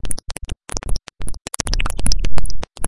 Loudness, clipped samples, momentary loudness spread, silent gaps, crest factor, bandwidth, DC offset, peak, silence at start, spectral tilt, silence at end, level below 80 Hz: -26 LUFS; under 0.1%; 10 LU; none; 14 dB; 11.5 kHz; under 0.1%; 0 dBFS; 0 s; -3 dB/octave; 0 s; -24 dBFS